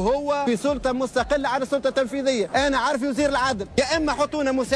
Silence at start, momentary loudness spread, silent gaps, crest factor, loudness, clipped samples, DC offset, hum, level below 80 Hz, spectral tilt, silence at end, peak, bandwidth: 0 s; 2 LU; none; 14 dB; -23 LUFS; under 0.1%; under 0.1%; none; -44 dBFS; -4 dB/octave; 0 s; -8 dBFS; 11 kHz